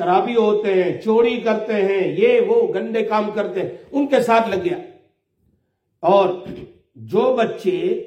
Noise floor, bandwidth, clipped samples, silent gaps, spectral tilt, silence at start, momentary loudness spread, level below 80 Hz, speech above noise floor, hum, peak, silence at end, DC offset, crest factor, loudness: -68 dBFS; 11 kHz; under 0.1%; none; -6.5 dB/octave; 0 s; 9 LU; -62 dBFS; 50 dB; none; -2 dBFS; 0 s; under 0.1%; 16 dB; -18 LUFS